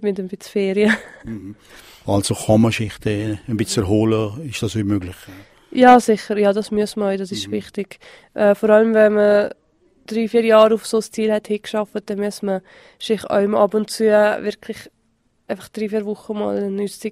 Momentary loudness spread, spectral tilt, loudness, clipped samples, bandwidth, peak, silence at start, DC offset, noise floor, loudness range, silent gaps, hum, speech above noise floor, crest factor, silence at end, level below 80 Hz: 17 LU; -5.5 dB/octave; -18 LUFS; under 0.1%; 16 kHz; 0 dBFS; 0 s; under 0.1%; -64 dBFS; 5 LU; none; none; 45 dB; 18 dB; 0 s; -52 dBFS